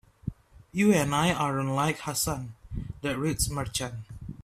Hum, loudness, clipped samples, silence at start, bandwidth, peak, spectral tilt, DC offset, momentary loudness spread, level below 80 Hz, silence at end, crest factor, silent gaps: none; -28 LUFS; under 0.1%; 0.25 s; 15.5 kHz; -10 dBFS; -4.5 dB/octave; under 0.1%; 17 LU; -46 dBFS; 0.1 s; 18 dB; none